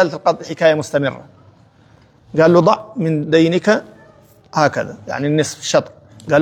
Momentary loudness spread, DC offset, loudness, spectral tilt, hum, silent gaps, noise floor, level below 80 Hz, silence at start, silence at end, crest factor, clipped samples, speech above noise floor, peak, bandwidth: 12 LU; under 0.1%; -16 LUFS; -5.5 dB/octave; none; none; -49 dBFS; -58 dBFS; 0 s; 0 s; 16 dB; under 0.1%; 34 dB; 0 dBFS; 15 kHz